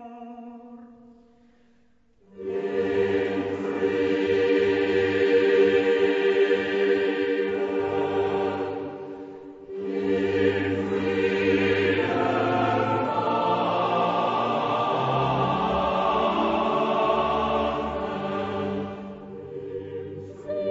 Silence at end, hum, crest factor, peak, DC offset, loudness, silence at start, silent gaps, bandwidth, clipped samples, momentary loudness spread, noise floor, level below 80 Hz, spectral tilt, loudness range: 0 s; none; 16 dB; -10 dBFS; under 0.1%; -24 LUFS; 0 s; none; 7.8 kHz; under 0.1%; 15 LU; -63 dBFS; -54 dBFS; -7 dB/octave; 6 LU